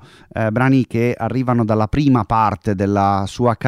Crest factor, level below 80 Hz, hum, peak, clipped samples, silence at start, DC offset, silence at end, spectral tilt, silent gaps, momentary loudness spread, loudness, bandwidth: 14 dB; -40 dBFS; none; -2 dBFS; under 0.1%; 0.35 s; under 0.1%; 0 s; -8 dB/octave; none; 5 LU; -17 LUFS; 12.5 kHz